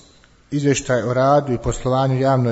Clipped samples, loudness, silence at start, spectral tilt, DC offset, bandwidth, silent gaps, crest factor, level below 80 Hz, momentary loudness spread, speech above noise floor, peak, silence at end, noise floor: under 0.1%; -19 LUFS; 0.5 s; -6 dB/octave; under 0.1%; 8 kHz; none; 14 dB; -40 dBFS; 6 LU; 33 dB; -4 dBFS; 0 s; -51 dBFS